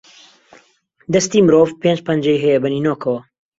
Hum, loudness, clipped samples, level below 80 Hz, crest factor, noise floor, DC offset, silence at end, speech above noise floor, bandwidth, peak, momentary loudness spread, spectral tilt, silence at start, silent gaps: none; -16 LUFS; under 0.1%; -56 dBFS; 16 dB; -56 dBFS; under 0.1%; 0.4 s; 41 dB; 7.8 kHz; -2 dBFS; 9 LU; -5.5 dB/octave; 1.1 s; none